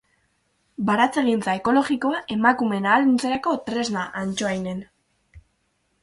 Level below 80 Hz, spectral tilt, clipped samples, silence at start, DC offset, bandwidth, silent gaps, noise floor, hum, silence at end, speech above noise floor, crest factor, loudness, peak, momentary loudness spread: -58 dBFS; -5 dB/octave; under 0.1%; 0.8 s; under 0.1%; 11.5 kHz; none; -70 dBFS; none; 0.65 s; 48 dB; 20 dB; -22 LUFS; -4 dBFS; 9 LU